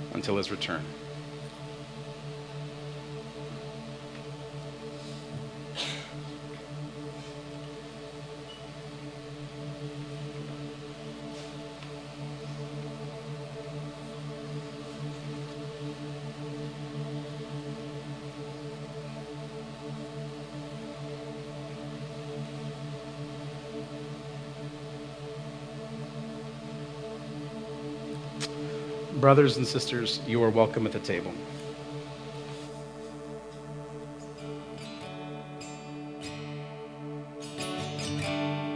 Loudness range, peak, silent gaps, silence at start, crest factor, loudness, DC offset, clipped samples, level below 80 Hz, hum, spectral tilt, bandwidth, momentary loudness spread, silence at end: 14 LU; -4 dBFS; none; 0 s; 30 dB; -35 LUFS; under 0.1%; under 0.1%; -62 dBFS; none; -5.5 dB/octave; 10.5 kHz; 12 LU; 0 s